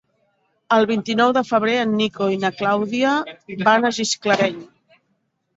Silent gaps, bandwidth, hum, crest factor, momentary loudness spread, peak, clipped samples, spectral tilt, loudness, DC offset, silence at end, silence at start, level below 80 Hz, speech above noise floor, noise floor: none; 8 kHz; none; 18 dB; 5 LU; -2 dBFS; under 0.1%; -4 dB/octave; -19 LUFS; under 0.1%; 0.95 s; 0.7 s; -64 dBFS; 51 dB; -70 dBFS